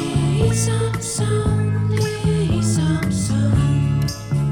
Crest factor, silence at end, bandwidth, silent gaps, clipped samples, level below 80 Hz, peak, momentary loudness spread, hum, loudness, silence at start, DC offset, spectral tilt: 12 dB; 0 s; 16.5 kHz; none; under 0.1%; -34 dBFS; -6 dBFS; 4 LU; none; -19 LUFS; 0 s; under 0.1%; -6 dB/octave